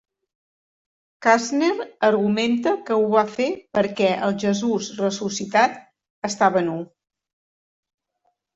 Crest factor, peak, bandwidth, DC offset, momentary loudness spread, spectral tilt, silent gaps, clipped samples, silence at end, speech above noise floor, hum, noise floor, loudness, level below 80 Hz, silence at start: 18 dB; -4 dBFS; 8 kHz; under 0.1%; 7 LU; -4.5 dB/octave; 6.10-6.22 s; under 0.1%; 1.7 s; 51 dB; none; -72 dBFS; -21 LUFS; -66 dBFS; 1.2 s